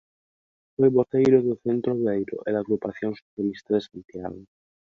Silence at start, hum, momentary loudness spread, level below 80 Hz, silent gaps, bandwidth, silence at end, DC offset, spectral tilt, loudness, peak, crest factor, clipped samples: 0.8 s; none; 17 LU; -62 dBFS; 3.22-3.37 s; 7 kHz; 0.45 s; under 0.1%; -8.5 dB/octave; -24 LUFS; -6 dBFS; 20 dB; under 0.1%